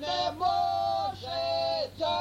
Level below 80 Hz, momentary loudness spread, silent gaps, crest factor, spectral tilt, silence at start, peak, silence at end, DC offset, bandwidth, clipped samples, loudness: -58 dBFS; 4 LU; none; 12 dB; -4 dB/octave; 0 s; -16 dBFS; 0 s; under 0.1%; 15 kHz; under 0.1%; -29 LUFS